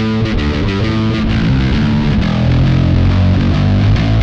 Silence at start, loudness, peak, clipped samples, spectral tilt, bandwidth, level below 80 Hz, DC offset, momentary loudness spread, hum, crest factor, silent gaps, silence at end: 0 s; -13 LUFS; -2 dBFS; under 0.1%; -8 dB/octave; 7.4 kHz; -20 dBFS; under 0.1%; 3 LU; none; 10 dB; none; 0 s